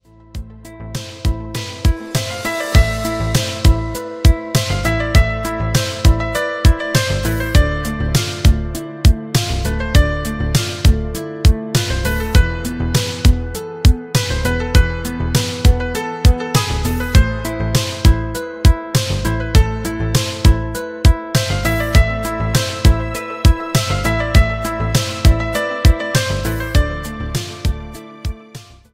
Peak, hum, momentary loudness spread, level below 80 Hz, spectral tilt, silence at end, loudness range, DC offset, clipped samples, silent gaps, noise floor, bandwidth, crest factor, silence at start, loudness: 0 dBFS; none; 9 LU; -18 dBFS; -5 dB/octave; 0.2 s; 1 LU; under 0.1%; under 0.1%; none; -38 dBFS; 16.5 kHz; 16 dB; 0.35 s; -17 LUFS